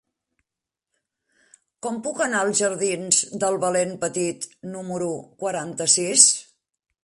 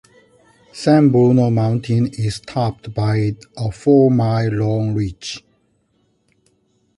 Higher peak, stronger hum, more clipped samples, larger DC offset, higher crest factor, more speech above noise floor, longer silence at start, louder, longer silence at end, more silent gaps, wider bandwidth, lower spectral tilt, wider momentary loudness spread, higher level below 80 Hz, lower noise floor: about the same, 0 dBFS vs -2 dBFS; neither; neither; neither; first, 24 dB vs 16 dB; first, 65 dB vs 47 dB; first, 1.85 s vs 0.75 s; second, -21 LUFS vs -17 LUFS; second, 0.6 s vs 1.6 s; neither; about the same, 11.5 kHz vs 11.5 kHz; second, -2 dB/octave vs -8 dB/octave; first, 17 LU vs 12 LU; second, -70 dBFS vs -46 dBFS; first, -87 dBFS vs -63 dBFS